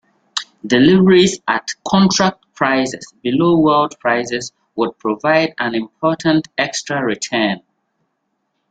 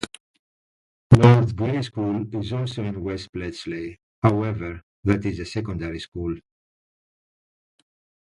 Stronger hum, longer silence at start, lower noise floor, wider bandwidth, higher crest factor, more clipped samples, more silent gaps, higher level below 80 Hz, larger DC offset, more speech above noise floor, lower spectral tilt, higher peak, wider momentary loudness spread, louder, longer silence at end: neither; first, 0.35 s vs 0 s; second, -70 dBFS vs under -90 dBFS; second, 9.2 kHz vs 11 kHz; second, 16 dB vs 24 dB; neither; second, none vs 0.20-1.10 s, 3.29-3.33 s, 4.03-4.22 s, 4.83-5.03 s, 6.08-6.12 s; second, -54 dBFS vs -44 dBFS; neither; second, 55 dB vs over 64 dB; second, -5 dB/octave vs -7.5 dB/octave; about the same, 0 dBFS vs 0 dBFS; second, 12 LU vs 17 LU; first, -16 LUFS vs -23 LUFS; second, 1.1 s vs 1.9 s